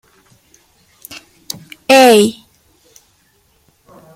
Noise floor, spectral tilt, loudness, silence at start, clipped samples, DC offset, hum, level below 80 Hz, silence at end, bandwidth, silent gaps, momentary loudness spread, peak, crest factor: -56 dBFS; -3 dB/octave; -10 LUFS; 1.1 s; under 0.1%; under 0.1%; none; -60 dBFS; 1.85 s; 16.5 kHz; none; 27 LU; 0 dBFS; 16 dB